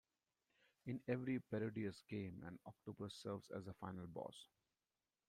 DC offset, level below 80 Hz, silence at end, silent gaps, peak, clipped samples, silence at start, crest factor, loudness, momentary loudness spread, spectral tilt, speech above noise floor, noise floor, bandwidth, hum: under 0.1%; -80 dBFS; 0.85 s; none; -28 dBFS; under 0.1%; 0.85 s; 22 dB; -49 LUFS; 12 LU; -7 dB/octave; over 42 dB; under -90 dBFS; 15 kHz; none